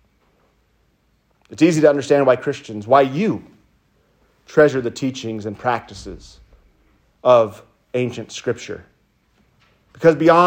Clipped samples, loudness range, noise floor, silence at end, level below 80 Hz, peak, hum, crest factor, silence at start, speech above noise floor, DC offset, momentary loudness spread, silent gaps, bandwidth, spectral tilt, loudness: under 0.1%; 4 LU; -62 dBFS; 0 s; -54 dBFS; 0 dBFS; none; 18 dB; 1.5 s; 45 dB; under 0.1%; 18 LU; none; 16 kHz; -6 dB/octave; -18 LUFS